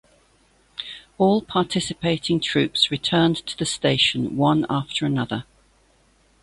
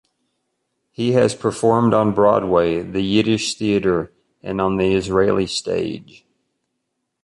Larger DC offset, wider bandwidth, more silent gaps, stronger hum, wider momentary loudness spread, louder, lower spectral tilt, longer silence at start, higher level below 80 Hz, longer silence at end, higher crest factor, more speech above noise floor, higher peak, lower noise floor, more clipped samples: neither; about the same, 11.5 kHz vs 11.5 kHz; neither; neither; first, 13 LU vs 9 LU; second, -21 LUFS vs -18 LUFS; about the same, -5 dB/octave vs -5.5 dB/octave; second, 0.8 s vs 1 s; second, -54 dBFS vs -48 dBFS; second, 1 s vs 1.2 s; about the same, 20 dB vs 16 dB; second, 38 dB vs 58 dB; about the same, -4 dBFS vs -2 dBFS; second, -59 dBFS vs -75 dBFS; neither